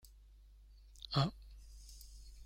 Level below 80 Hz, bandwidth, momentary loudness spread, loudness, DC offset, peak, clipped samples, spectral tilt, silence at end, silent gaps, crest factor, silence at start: -56 dBFS; 16 kHz; 24 LU; -38 LUFS; under 0.1%; -20 dBFS; under 0.1%; -6 dB/octave; 0 s; none; 24 dB; 0.05 s